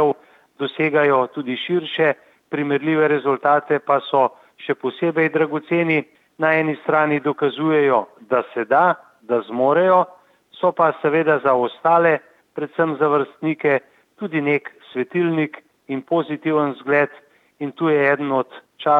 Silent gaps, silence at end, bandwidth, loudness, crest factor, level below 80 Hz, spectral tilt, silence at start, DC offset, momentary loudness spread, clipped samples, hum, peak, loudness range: none; 0 s; 4.7 kHz; -19 LUFS; 16 dB; -76 dBFS; -8.5 dB/octave; 0 s; under 0.1%; 11 LU; under 0.1%; none; -2 dBFS; 4 LU